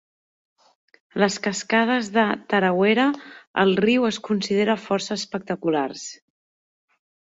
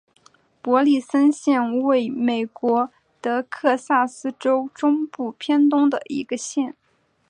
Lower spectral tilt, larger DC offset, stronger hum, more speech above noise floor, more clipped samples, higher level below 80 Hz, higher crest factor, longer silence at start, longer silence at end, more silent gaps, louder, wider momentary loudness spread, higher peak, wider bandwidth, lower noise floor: about the same, -4.5 dB/octave vs -4 dB/octave; neither; neither; first, over 68 dB vs 45 dB; neither; first, -66 dBFS vs -74 dBFS; about the same, 18 dB vs 16 dB; first, 1.15 s vs 0.65 s; first, 1.05 s vs 0.6 s; first, 3.47-3.54 s vs none; about the same, -22 LUFS vs -21 LUFS; about the same, 10 LU vs 10 LU; about the same, -4 dBFS vs -4 dBFS; second, 8 kHz vs 10 kHz; first, under -90 dBFS vs -65 dBFS